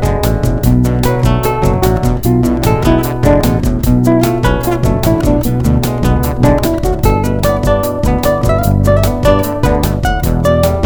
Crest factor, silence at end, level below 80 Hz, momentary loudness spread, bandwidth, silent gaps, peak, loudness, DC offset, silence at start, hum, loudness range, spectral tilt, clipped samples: 10 dB; 0 s; -18 dBFS; 3 LU; over 20 kHz; none; 0 dBFS; -12 LUFS; under 0.1%; 0 s; none; 1 LU; -7 dB/octave; 0.3%